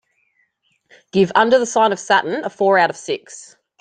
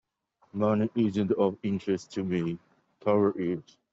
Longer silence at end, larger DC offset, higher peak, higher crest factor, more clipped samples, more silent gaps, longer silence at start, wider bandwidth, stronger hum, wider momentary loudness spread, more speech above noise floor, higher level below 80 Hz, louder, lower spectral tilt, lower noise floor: about the same, 0.35 s vs 0.3 s; neither; first, 0 dBFS vs -12 dBFS; about the same, 18 dB vs 16 dB; neither; neither; first, 1.15 s vs 0.55 s; first, 9.4 kHz vs 7.8 kHz; neither; first, 12 LU vs 9 LU; first, 48 dB vs 41 dB; first, -62 dBFS vs -68 dBFS; first, -17 LUFS vs -29 LUFS; second, -4 dB/octave vs -8 dB/octave; second, -65 dBFS vs -69 dBFS